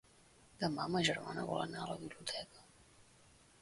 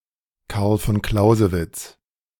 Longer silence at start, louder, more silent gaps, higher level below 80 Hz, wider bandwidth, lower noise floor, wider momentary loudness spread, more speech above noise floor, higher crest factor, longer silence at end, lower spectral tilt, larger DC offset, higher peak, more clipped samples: about the same, 0.45 s vs 0.5 s; second, -39 LUFS vs -20 LUFS; neither; second, -70 dBFS vs -36 dBFS; second, 11.5 kHz vs 18 kHz; first, -66 dBFS vs -50 dBFS; second, 10 LU vs 16 LU; second, 26 dB vs 31 dB; about the same, 22 dB vs 18 dB; about the same, 0.6 s vs 0.5 s; second, -4 dB/octave vs -6.5 dB/octave; neither; second, -20 dBFS vs -2 dBFS; neither